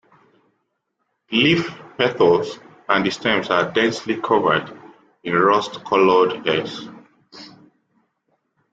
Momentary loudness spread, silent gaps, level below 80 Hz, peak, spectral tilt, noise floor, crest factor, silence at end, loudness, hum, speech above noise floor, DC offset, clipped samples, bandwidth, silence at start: 16 LU; none; -60 dBFS; -2 dBFS; -5 dB/octave; -74 dBFS; 18 dB; 1.25 s; -19 LUFS; none; 55 dB; under 0.1%; under 0.1%; 8 kHz; 1.3 s